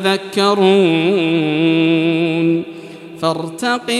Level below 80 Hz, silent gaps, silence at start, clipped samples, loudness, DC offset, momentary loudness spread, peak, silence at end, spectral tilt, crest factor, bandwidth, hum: -66 dBFS; none; 0 s; under 0.1%; -15 LUFS; under 0.1%; 9 LU; 0 dBFS; 0 s; -5.5 dB/octave; 14 dB; 12.5 kHz; none